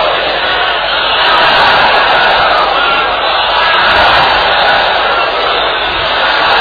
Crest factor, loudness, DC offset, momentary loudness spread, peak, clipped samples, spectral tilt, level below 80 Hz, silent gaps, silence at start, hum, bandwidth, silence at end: 10 dB; -8 LUFS; under 0.1%; 4 LU; 0 dBFS; 0.3%; -4 dB/octave; -34 dBFS; none; 0 s; none; 5.4 kHz; 0 s